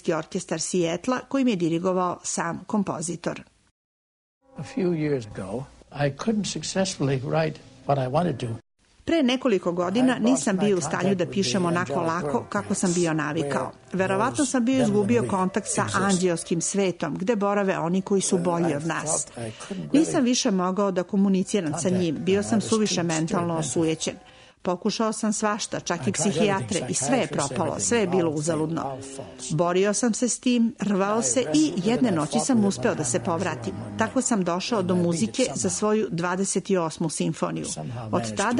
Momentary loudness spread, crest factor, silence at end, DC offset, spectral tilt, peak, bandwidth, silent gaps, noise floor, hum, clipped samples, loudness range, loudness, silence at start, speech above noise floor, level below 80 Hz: 8 LU; 16 dB; 0 s; under 0.1%; -4.5 dB/octave; -8 dBFS; 11 kHz; 3.71-4.41 s; under -90 dBFS; none; under 0.1%; 4 LU; -24 LUFS; 0.05 s; over 66 dB; -58 dBFS